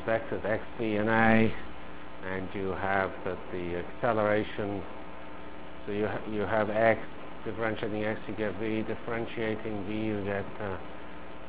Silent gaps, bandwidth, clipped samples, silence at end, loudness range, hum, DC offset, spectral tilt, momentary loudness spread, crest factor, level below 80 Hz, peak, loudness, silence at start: none; 4 kHz; under 0.1%; 0 s; 4 LU; none; 1%; -5 dB/octave; 18 LU; 22 dB; -52 dBFS; -10 dBFS; -31 LUFS; 0 s